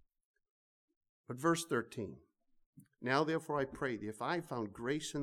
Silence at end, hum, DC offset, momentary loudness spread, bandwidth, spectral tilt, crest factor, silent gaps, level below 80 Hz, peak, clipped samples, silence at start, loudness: 0 s; none; under 0.1%; 11 LU; 16 kHz; -5 dB/octave; 22 dB; 2.66-2.73 s; -72 dBFS; -18 dBFS; under 0.1%; 1.3 s; -38 LUFS